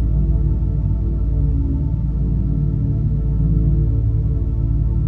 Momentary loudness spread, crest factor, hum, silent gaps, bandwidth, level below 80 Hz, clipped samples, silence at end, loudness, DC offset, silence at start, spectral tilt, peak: 3 LU; 12 dB; none; none; 1.4 kHz; -20 dBFS; under 0.1%; 0 s; -20 LUFS; under 0.1%; 0 s; -13 dB/octave; -4 dBFS